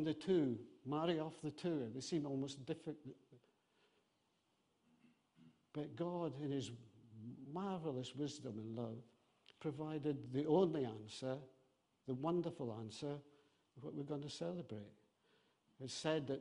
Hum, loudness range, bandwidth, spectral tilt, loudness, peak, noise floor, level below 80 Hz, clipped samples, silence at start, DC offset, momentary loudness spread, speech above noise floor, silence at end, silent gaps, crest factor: none; 8 LU; 10.5 kHz; -6.5 dB/octave; -44 LUFS; -24 dBFS; -82 dBFS; -82 dBFS; under 0.1%; 0 s; under 0.1%; 16 LU; 39 dB; 0 s; none; 22 dB